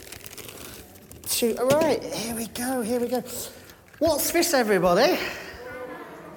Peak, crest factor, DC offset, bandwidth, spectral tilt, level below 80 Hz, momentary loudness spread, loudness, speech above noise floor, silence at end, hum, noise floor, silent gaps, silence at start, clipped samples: -8 dBFS; 18 dB; under 0.1%; 19 kHz; -3.5 dB/octave; -54 dBFS; 18 LU; -24 LUFS; 22 dB; 0 s; none; -45 dBFS; none; 0 s; under 0.1%